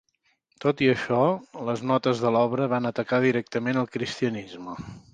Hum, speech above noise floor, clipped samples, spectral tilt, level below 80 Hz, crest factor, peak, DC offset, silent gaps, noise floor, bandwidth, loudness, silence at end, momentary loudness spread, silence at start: none; 45 dB; under 0.1%; -6.5 dB/octave; -62 dBFS; 18 dB; -8 dBFS; under 0.1%; none; -70 dBFS; 9.2 kHz; -25 LUFS; 0.15 s; 11 LU; 0.6 s